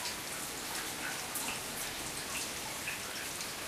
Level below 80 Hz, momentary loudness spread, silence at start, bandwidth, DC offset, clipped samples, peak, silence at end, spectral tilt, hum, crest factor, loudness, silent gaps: -62 dBFS; 2 LU; 0 s; 15.5 kHz; under 0.1%; under 0.1%; -22 dBFS; 0 s; -1 dB/octave; none; 18 dB; -37 LUFS; none